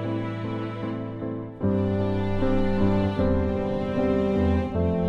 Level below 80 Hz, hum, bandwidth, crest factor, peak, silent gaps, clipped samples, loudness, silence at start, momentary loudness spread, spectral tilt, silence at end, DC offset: -36 dBFS; none; 7 kHz; 14 dB; -10 dBFS; none; under 0.1%; -26 LUFS; 0 s; 8 LU; -9.5 dB/octave; 0 s; under 0.1%